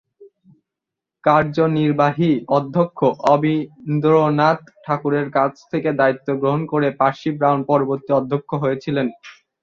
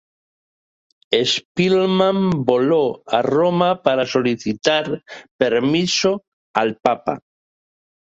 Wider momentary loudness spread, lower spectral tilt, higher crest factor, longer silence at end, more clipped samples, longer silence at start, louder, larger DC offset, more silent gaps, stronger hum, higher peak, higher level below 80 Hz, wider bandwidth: about the same, 7 LU vs 7 LU; first, -8.5 dB/octave vs -5 dB/octave; about the same, 16 dB vs 20 dB; second, 0.3 s vs 1 s; neither; second, 0.2 s vs 1.1 s; about the same, -19 LUFS vs -18 LUFS; neither; second, none vs 1.45-1.55 s, 5.31-5.39 s, 6.28-6.54 s; neither; about the same, -2 dBFS vs 0 dBFS; about the same, -60 dBFS vs -58 dBFS; second, 7.2 kHz vs 8 kHz